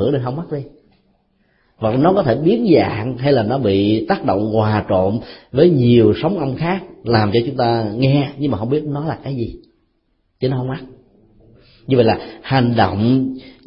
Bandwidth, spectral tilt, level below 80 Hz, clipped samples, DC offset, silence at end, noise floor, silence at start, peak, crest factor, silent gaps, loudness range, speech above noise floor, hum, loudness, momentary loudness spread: 5.6 kHz; -12.5 dB/octave; -46 dBFS; under 0.1%; under 0.1%; 0.15 s; -64 dBFS; 0 s; 0 dBFS; 16 dB; none; 7 LU; 48 dB; none; -17 LUFS; 11 LU